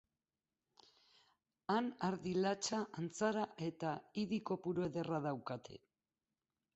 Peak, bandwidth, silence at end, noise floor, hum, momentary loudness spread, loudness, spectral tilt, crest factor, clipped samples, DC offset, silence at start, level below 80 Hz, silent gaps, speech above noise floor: -22 dBFS; 8 kHz; 1 s; under -90 dBFS; none; 9 LU; -41 LUFS; -5 dB/octave; 20 dB; under 0.1%; under 0.1%; 1.7 s; -78 dBFS; none; over 50 dB